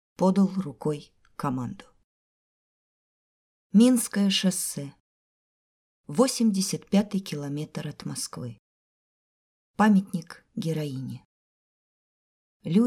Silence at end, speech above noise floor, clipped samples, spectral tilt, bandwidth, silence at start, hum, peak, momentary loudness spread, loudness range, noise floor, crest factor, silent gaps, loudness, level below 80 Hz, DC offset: 0 s; over 65 dB; under 0.1%; -5 dB/octave; 16.5 kHz; 0.2 s; none; -8 dBFS; 18 LU; 5 LU; under -90 dBFS; 20 dB; 2.04-3.70 s, 5.00-6.04 s, 8.59-9.74 s, 11.25-12.60 s; -26 LUFS; -68 dBFS; under 0.1%